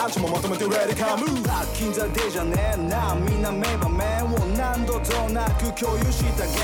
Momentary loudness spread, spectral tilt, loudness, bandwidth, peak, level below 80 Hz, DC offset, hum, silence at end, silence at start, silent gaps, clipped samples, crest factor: 2 LU; -5 dB/octave; -24 LUFS; 19 kHz; -12 dBFS; -28 dBFS; under 0.1%; none; 0 s; 0 s; none; under 0.1%; 10 dB